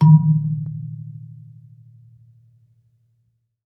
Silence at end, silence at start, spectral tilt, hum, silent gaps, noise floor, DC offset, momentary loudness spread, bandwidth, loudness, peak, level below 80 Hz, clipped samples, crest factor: 2.35 s; 0 s; -12 dB/octave; none; none; -68 dBFS; under 0.1%; 27 LU; 1.2 kHz; -19 LUFS; -2 dBFS; -70 dBFS; under 0.1%; 18 dB